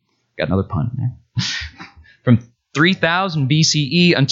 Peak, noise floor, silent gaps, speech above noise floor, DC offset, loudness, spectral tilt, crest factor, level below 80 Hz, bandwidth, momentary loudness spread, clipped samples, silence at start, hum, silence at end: 0 dBFS; -41 dBFS; none; 25 dB; under 0.1%; -18 LUFS; -5 dB/octave; 16 dB; -46 dBFS; 7.8 kHz; 11 LU; under 0.1%; 0.4 s; none; 0 s